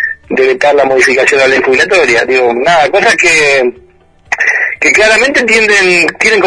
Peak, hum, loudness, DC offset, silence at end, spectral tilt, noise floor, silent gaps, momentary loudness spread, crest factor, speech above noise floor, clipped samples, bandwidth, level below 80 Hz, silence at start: 0 dBFS; none; -7 LUFS; under 0.1%; 0 s; -2.5 dB/octave; -43 dBFS; none; 5 LU; 8 dB; 35 dB; under 0.1%; 11 kHz; -42 dBFS; 0 s